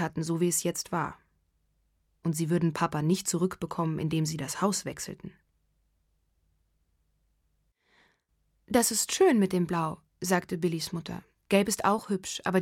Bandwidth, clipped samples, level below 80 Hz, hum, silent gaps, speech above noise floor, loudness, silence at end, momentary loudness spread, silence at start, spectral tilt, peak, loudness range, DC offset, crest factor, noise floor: 17 kHz; under 0.1%; -62 dBFS; none; none; 45 dB; -29 LUFS; 0 s; 12 LU; 0 s; -4.5 dB/octave; -8 dBFS; 8 LU; under 0.1%; 22 dB; -74 dBFS